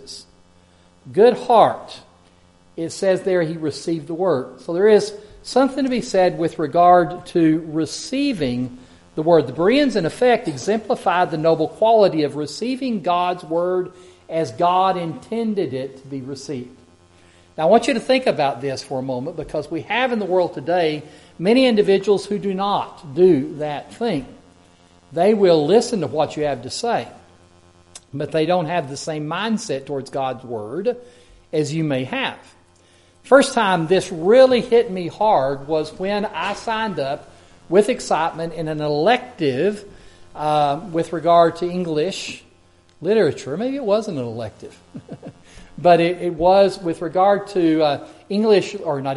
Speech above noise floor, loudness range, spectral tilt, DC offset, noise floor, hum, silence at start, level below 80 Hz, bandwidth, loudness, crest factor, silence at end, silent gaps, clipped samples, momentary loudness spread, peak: 34 dB; 6 LU; -5.5 dB/octave; under 0.1%; -53 dBFS; none; 0 s; -54 dBFS; 11.5 kHz; -19 LUFS; 18 dB; 0 s; none; under 0.1%; 14 LU; 0 dBFS